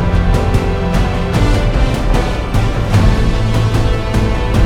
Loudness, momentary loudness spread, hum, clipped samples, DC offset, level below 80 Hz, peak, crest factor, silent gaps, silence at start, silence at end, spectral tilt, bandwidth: -15 LUFS; 3 LU; none; under 0.1%; under 0.1%; -16 dBFS; 0 dBFS; 12 dB; none; 0 s; 0 s; -6.5 dB/octave; 13.5 kHz